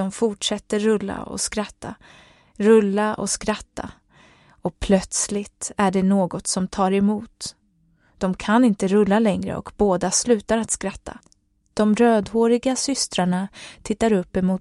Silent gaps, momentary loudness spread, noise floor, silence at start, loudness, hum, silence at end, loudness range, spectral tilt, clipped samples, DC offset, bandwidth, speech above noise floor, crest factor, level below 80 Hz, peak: none; 14 LU; -61 dBFS; 0 s; -21 LUFS; none; 0 s; 3 LU; -4.5 dB/octave; under 0.1%; under 0.1%; 12 kHz; 40 dB; 18 dB; -46 dBFS; -4 dBFS